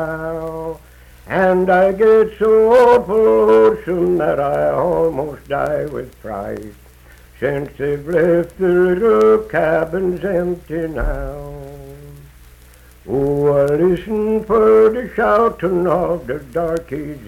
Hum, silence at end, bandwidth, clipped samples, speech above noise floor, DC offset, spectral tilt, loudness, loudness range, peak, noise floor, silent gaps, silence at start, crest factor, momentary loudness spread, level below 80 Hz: none; 0 s; 14.5 kHz; under 0.1%; 29 dB; under 0.1%; -8 dB/octave; -16 LUFS; 9 LU; -2 dBFS; -44 dBFS; none; 0 s; 14 dB; 15 LU; -36 dBFS